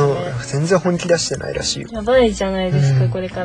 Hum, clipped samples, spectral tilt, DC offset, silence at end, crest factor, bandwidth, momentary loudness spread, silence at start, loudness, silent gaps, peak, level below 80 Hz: none; under 0.1%; -5.5 dB/octave; under 0.1%; 0 s; 14 dB; 10.5 kHz; 7 LU; 0 s; -18 LUFS; none; -2 dBFS; -38 dBFS